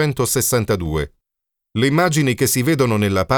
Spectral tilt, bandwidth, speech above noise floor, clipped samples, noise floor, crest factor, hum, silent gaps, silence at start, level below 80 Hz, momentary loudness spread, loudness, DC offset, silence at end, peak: -4.5 dB/octave; over 20 kHz; 65 dB; under 0.1%; -82 dBFS; 16 dB; none; none; 0 s; -40 dBFS; 8 LU; -18 LUFS; under 0.1%; 0 s; -2 dBFS